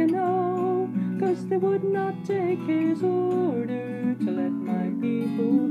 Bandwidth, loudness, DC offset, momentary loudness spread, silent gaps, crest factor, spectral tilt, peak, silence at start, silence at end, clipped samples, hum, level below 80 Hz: 9.8 kHz; -26 LUFS; under 0.1%; 4 LU; none; 12 dB; -9 dB/octave; -12 dBFS; 0 s; 0 s; under 0.1%; none; -76 dBFS